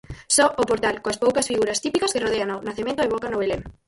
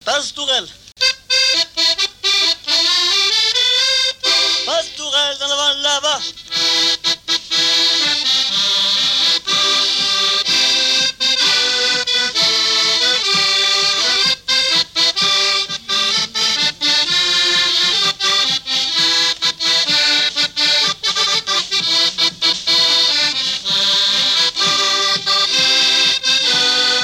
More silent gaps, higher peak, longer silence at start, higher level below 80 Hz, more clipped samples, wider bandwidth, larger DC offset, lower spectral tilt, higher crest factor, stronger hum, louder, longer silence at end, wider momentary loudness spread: neither; about the same, -4 dBFS vs -4 dBFS; about the same, 0.1 s vs 0.05 s; first, -48 dBFS vs -56 dBFS; neither; second, 12 kHz vs 17 kHz; neither; first, -2.5 dB/octave vs 0.5 dB/octave; first, 18 dB vs 12 dB; neither; second, -22 LUFS vs -13 LUFS; first, 0.15 s vs 0 s; first, 8 LU vs 4 LU